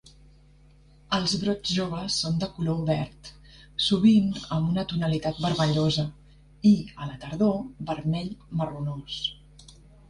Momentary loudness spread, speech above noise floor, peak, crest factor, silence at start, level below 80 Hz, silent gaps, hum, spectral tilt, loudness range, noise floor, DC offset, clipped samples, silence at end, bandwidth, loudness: 12 LU; 29 dB; -10 dBFS; 18 dB; 1.1 s; -52 dBFS; none; none; -6 dB/octave; 4 LU; -55 dBFS; under 0.1%; under 0.1%; 0.4 s; 11 kHz; -26 LUFS